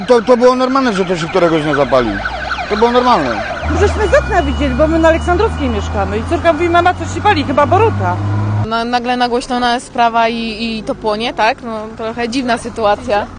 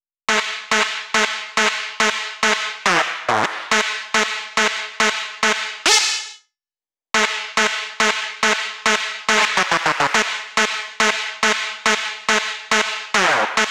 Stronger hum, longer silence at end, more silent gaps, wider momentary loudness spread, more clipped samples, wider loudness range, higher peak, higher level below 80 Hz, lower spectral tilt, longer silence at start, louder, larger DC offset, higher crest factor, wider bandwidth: neither; about the same, 0 s vs 0 s; neither; first, 8 LU vs 4 LU; neither; about the same, 3 LU vs 1 LU; about the same, 0 dBFS vs -2 dBFS; first, -28 dBFS vs -62 dBFS; first, -6 dB/octave vs -0.5 dB/octave; second, 0 s vs 0.3 s; first, -14 LUFS vs -18 LUFS; neither; about the same, 14 dB vs 18 dB; second, 10 kHz vs over 20 kHz